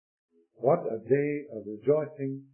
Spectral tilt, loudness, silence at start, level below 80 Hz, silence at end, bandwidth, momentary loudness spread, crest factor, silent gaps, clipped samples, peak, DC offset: -12.5 dB/octave; -29 LUFS; 0.6 s; -80 dBFS; 0.1 s; 3.1 kHz; 9 LU; 18 dB; none; under 0.1%; -12 dBFS; under 0.1%